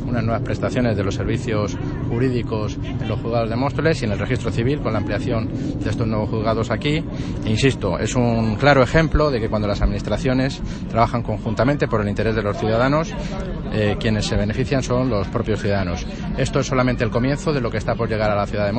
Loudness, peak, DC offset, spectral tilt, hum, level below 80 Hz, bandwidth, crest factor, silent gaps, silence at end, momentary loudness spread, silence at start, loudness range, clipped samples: -21 LUFS; 0 dBFS; under 0.1%; -6.5 dB/octave; none; -32 dBFS; 8.8 kHz; 20 dB; none; 0 s; 6 LU; 0 s; 3 LU; under 0.1%